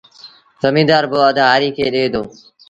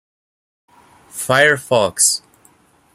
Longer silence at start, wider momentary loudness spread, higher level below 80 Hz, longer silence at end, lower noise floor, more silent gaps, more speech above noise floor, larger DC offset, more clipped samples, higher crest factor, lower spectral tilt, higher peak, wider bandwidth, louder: second, 0.25 s vs 1.15 s; second, 8 LU vs 13 LU; first, -52 dBFS vs -60 dBFS; second, 0.4 s vs 0.75 s; second, -43 dBFS vs -53 dBFS; neither; second, 29 dB vs 38 dB; neither; neither; about the same, 16 dB vs 20 dB; first, -6 dB/octave vs -2 dB/octave; about the same, 0 dBFS vs 0 dBFS; second, 9 kHz vs 16 kHz; about the same, -14 LUFS vs -15 LUFS